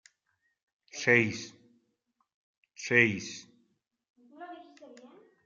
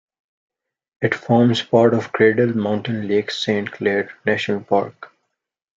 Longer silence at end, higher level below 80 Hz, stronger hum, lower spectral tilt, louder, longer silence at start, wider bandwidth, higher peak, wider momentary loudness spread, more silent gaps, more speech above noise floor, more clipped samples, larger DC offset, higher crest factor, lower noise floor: second, 0.4 s vs 0.7 s; second, -76 dBFS vs -64 dBFS; neither; second, -4.5 dB/octave vs -6.5 dB/octave; second, -26 LUFS vs -19 LUFS; about the same, 0.95 s vs 1 s; about the same, 7.6 kHz vs 7.8 kHz; second, -6 dBFS vs -2 dBFS; first, 23 LU vs 7 LU; first, 2.34-2.63 s, 4.10-4.14 s vs none; second, 51 dB vs 59 dB; neither; neither; first, 28 dB vs 18 dB; about the same, -78 dBFS vs -77 dBFS